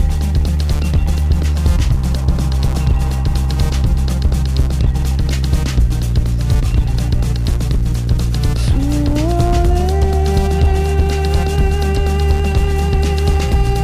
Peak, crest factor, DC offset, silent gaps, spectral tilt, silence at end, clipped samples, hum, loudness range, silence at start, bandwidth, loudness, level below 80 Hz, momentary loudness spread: -4 dBFS; 8 dB; under 0.1%; none; -6.5 dB/octave; 0 s; under 0.1%; none; 1 LU; 0 s; 15 kHz; -16 LUFS; -16 dBFS; 3 LU